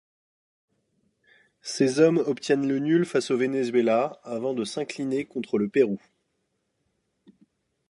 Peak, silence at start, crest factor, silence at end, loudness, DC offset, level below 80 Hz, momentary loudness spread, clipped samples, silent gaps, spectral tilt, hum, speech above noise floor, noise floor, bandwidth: -6 dBFS; 1.65 s; 20 dB; 1.95 s; -25 LUFS; under 0.1%; -76 dBFS; 10 LU; under 0.1%; none; -5.5 dB/octave; none; 52 dB; -76 dBFS; 11.5 kHz